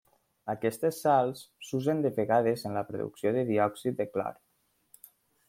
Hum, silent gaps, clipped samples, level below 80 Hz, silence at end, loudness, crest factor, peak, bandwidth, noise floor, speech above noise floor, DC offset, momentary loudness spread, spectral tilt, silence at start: none; none; under 0.1%; -72 dBFS; 1.15 s; -30 LUFS; 18 dB; -12 dBFS; 16.5 kHz; -73 dBFS; 44 dB; under 0.1%; 11 LU; -6.5 dB/octave; 0.45 s